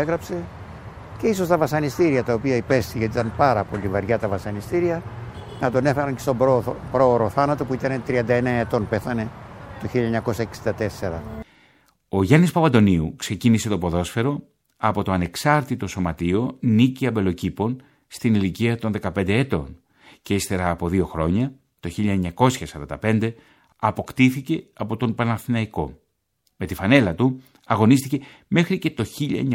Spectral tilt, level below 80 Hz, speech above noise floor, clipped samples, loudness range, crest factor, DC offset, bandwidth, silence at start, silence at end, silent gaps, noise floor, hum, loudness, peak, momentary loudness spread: -6.5 dB/octave; -46 dBFS; 49 dB; under 0.1%; 4 LU; 20 dB; under 0.1%; 16.5 kHz; 0 s; 0 s; none; -70 dBFS; none; -22 LUFS; -2 dBFS; 13 LU